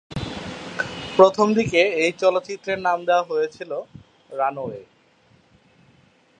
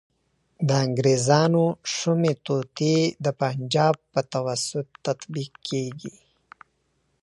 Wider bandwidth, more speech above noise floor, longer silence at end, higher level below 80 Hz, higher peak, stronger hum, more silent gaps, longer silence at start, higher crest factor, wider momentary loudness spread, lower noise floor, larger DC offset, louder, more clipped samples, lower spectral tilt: second, 9.4 kHz vs 11.5 kHz; second, 37 dB vs 47 dB; first, 1.55 s vs 1.15 s; first, -52 dBFS vs -66 dBFS; first, 0 dBFS vs -4 dBFS; neither; neither; second, 0.1 s vs 0.6 s; about the same, 22 dB vs 20 dB; first, 17 LU vs 11 LU; second, -57 dBFS vs -71 dBFS; neither; first, -21 LUFS vs -24 LUFS; neither; about the same, -5 dB/octave vs -5.5 dB/octave